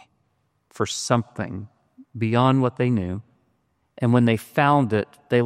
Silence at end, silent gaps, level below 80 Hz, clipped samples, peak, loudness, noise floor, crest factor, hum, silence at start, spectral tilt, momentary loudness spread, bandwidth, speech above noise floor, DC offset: 0 s; none; -60 dBFS; under 0.1%; -4 dBFS; -22 LUFS; -69 dBFS; 18 dB; none; 0.8 s; -6 dB/octave; 13 LU; 14.5 kHz; 48 dB; under 0.1%